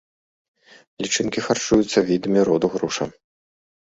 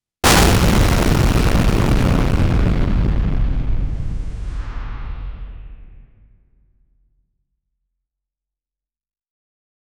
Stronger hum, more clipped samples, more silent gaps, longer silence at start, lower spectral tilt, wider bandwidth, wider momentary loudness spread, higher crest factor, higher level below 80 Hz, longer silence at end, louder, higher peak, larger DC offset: neither; neither; neither; first, 1 s vs 0.25 s; about the same, -4 dB/octave vs -5 dB/octave; second, 8 kHz vs over 20 kHz; second, 9 LU vs 18 LU; about the same, 18 dB vs 16 dB; second, -52 dBFS vs -22 dBFS; second, 0.7 s vs 3.95 s; second, -21 LUFS vs -17 LUFS; about the same, -4 dBFS vs -2 dBFS; neither